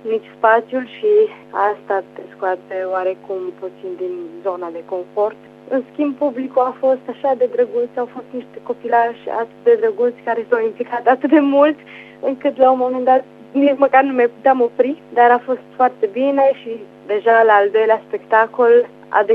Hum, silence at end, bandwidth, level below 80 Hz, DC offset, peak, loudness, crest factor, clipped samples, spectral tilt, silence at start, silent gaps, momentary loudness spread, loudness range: 50 Hz at -55 dBFS; 0 s; 4.8 kHz; -72 dBFS; under 0.1%; 0 dBFS; -17 LUFS; 16 dB; under 0.1%; -7 dB/octave; 0.05 s; none; 13 LU; 8 LU